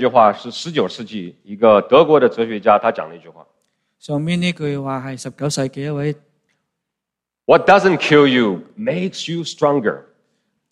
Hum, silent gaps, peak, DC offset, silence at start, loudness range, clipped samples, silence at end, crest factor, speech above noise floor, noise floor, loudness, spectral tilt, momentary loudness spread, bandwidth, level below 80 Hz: none; none; 0 dBFS; under 0.1%; 0 s; 8 LU; under 0.1%; 0.7 s; 18 dB; 68 dB; -84 dBFS; -16 LUFS; -5.5 dB/octave; 17 LU; 12 kHz; -60 dBFS